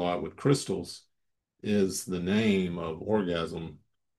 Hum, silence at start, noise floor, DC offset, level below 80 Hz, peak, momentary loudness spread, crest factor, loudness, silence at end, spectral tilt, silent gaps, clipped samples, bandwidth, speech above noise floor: none; 0 s; -81 dBFS; under 0.1%; -64 dBFS; -12 dBFS; 14 LU; 18 dB; -29 LUFS; 0.45 s; -5.5 dB/octave; none; under 0.1%; 12.5 kHz; 53 dB